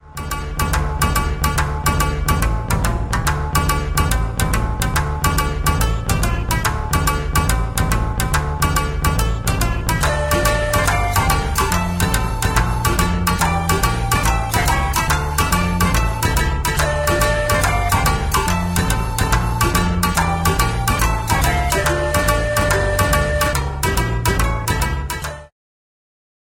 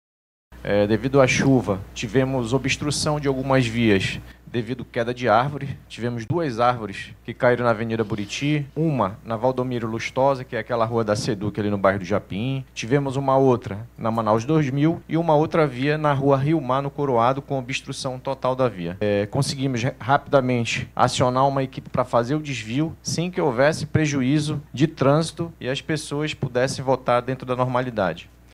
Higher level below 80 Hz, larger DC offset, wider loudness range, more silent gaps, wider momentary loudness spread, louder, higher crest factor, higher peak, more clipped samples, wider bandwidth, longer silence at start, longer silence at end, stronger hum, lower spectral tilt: first, -22 dBFS vs -48 dBFS; neither; about the same, 2 LU vs 3 LU; neither; second, 3 LU vs 8 LU; first, -18 LUFS vs -22 LUFS; about the same, 16 dB vs 20 dB; about the same, -2 dBFS vs -2 dBFS; neither; first, 17 kHz vs 14.5 kHz; second, 0.05 s vs 0.5 s; first, 1.05 s vs 0.3 s; neither; second, -4.5 dB/octave vs -6 dB/octave